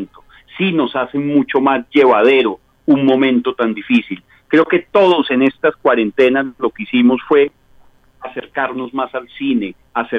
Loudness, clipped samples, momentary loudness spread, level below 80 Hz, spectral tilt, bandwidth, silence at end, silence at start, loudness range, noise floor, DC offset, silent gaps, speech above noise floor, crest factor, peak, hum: -15 LUFS; under 0.1%; 11 LU; -56 dBFS; -7.5 dB/octave; 6 kHz; 0 s; 0 s; 4 LU; -48 dBFS; under 0.1%; none; 33 dB; 14 dB; 0 dBFS; none